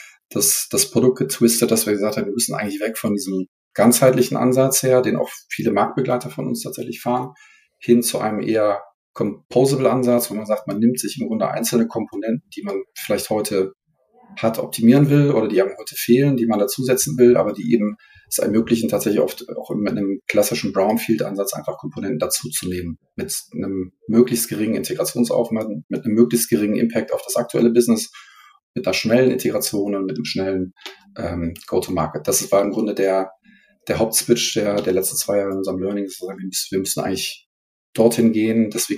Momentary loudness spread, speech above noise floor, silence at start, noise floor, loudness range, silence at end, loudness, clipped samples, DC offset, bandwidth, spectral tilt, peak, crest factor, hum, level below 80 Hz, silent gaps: 11 LU; 36 dB; 0 s; -55 dBFS; 4 LU; 0 s; -19 LUFS; under 0.1%; under 0.1%; 15.5 kHz; -4.5 dB/octave; -2 dBFS; 18 dB; none; -56 dBFS; 0.25-0.29 s, 3.48-3.71 s, 8.94-9.14 s, 9.45-9.49 s, 25.84-25.89 s, 28.63-28.74 s, 37.46-37.93 s